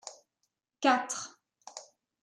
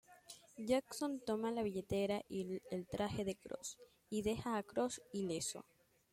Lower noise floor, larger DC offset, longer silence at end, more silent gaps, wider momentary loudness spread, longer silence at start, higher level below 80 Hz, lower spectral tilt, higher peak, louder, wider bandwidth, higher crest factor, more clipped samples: first, -83 dBFS vs -61 dBFS; neither; about the same, 0.4 s vs 0.5 s; neither; first, 21 LU vs 11 LU; about the same, 0.05 s vs 0.1 s; second, under -90 dBFS vs -68 dBFS; second, -1 dB/octave vs -4.5 dB/octave; first, -14 dBFS vs -22 dBFS; first, -30 LUFS vs -42 LUFS; second, 13.5 kHz vs 16.5 kHz; about the same, 22 dB vs 18 dB; neither